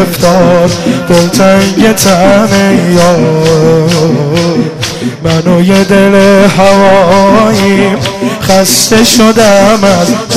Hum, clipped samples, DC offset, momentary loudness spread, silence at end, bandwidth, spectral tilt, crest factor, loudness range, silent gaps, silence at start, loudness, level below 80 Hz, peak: none; 2%; 2%; 7 LU; 0 s; 16 kHz; -5 dB/octave; 6 dB; 2 LU; none; 0 s; -6 LUFS; -32 dBFS; 0 dBFS